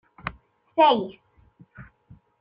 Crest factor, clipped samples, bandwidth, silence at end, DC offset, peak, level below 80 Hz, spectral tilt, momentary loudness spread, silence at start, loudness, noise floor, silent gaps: 20 dB; under 0.1%; 5.4 kHz; 0.6 s; under 0.1%; -6 dBFS; -58 dBFS; -8 dB/octave; 18 LU; 0.25 s; -21 LUFS; -56 dBFS; none